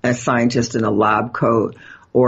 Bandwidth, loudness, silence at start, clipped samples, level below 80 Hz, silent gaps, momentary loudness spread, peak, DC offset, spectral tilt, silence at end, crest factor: 8 kHz; -18 LUFS; 0.05 s; under 0.1%; -50 dBFS; none; 4 LU; -4 dBFS; under 0.1%; -6 dB/octave; 0 s; 14 dB